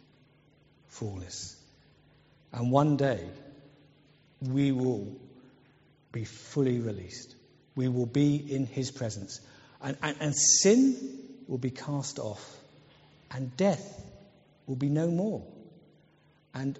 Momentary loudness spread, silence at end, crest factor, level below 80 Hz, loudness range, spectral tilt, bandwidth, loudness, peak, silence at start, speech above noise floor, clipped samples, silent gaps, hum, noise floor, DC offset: 21 LU; 0 s; 22 dB; -66 dBFS; 8 LU; -6 dB/octave; 8 kHz; -29 LUFS; -10 dBFS; 0.95 s; 35 dB; under 0.1%; none; none; -64 dBFS; under 0.1%